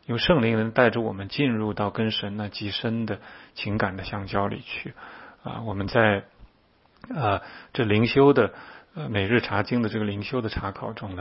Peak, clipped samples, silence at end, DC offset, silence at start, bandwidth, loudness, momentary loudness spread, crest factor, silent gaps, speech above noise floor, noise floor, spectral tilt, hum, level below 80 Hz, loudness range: -2 dBFS; under 0.1%; 0 s; under 0.1%; 0.1 s; 5.8 kHz; -25 LUFS; 15 LU; 22 dB; none; 36 dB; -61 dBFS; -10.5 dB/octave; none; -50 dBFS; 6 LU